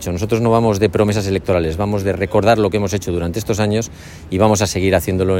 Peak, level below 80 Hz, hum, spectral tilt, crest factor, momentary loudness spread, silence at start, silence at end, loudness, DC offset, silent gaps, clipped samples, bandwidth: 0 dBFS; -40 dBFS; none; -6 dB/octave; 16 dB; 7 LU; 0 s; 0 s; -17 LUFS; under 0.1%; none; under 0.1%; 16.5 kHz